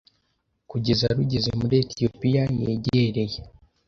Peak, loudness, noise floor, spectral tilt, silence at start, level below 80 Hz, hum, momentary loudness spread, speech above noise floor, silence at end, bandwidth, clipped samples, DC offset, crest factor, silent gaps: -8 dBFS; -24 LUFS; -72 dBFS; -7 dB/octave; 0.7 s; -46 dBFS; none; 7 LU; 50 dB; 0.4 s; 6.8 kHz; under 0.1%; under 0.1%; 18 dB; none